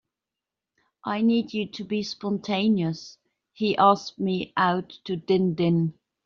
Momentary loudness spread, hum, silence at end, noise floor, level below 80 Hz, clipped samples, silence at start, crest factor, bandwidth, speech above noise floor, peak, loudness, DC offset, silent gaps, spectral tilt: 11 LU; none; 0.35 s; -88 dBFS; -66 dBFS; under 0.1%; 1.05 s; 20 dB; 7.2 kHz; 64 dB; -4 dBFS; -25 LUFS; under 0.1%; none; -5 dB/octave